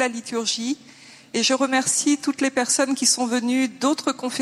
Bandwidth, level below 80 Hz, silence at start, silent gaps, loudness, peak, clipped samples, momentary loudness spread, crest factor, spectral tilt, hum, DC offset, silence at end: 14.5 kHz; -74 dBFS; 0 s; none; -21 LUFS; -6 dBFS; under 0.1%; 7 LU; 18 dB; -1.5 dB/octave; none; under 0.1%; 0 s